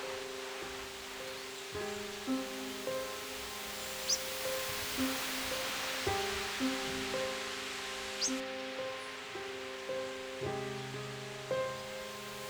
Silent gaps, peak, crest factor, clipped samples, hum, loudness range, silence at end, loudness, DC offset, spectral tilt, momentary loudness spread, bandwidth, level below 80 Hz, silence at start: none; -20 dBFS; 18 dB; under 0.1%; none; 5 LU; 0 s; -37 LUFS; under 0.1%; -2.5 dB/octave; 8 LU; over 20 kHz; -62 dBFS; 0 s